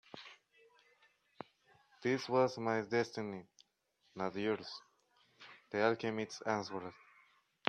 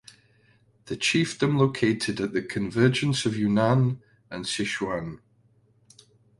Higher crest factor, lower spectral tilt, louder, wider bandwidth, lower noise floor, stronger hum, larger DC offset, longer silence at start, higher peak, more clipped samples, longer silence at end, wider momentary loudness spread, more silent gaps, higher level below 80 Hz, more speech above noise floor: first, 28 dB vs 20 dB; about the same, -5.5 dB/octave vs -5.5 dB/octave; second, -37 LUFS vs -25 LUFS; second, 10 kHz vs 11.5 kHz; first, -78 dBFS vs -63 dBFS; neither; neither; second, 0.15 s vs 0.85 s; second, -12 dBFS vs -6 dBFS; neither; second, 0.75 s vs 1.25 s; first, 21 LU vs 12 LU; neither; second, -82 dBFS vs -58 dBFS; about the same, 41 dB vs 38 dB